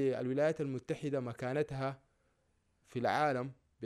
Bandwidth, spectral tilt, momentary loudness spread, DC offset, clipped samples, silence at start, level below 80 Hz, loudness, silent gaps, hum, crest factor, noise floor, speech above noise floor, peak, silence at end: 13 kHz; -7 dB/octave; 9 LU; under 0.1%; under 0.1%; 0 s; -70 dBFS; -36 LUFS; none; none; 18 dB; -76 dBFS; 41 dB; -18 dBFS; 0 s